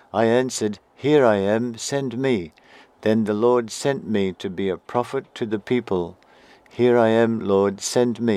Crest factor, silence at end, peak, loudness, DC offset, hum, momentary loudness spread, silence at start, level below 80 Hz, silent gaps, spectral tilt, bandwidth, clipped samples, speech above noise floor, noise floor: 18 dB; 0 s; -2 dBFS; -21 LUFS; under 0.1%; none; 10 LU; 0.15 s; -64 dBFS; none; -5.5 dB/octave; 14.5 kHz; under 0.1%; 30 dB; -51 dBFS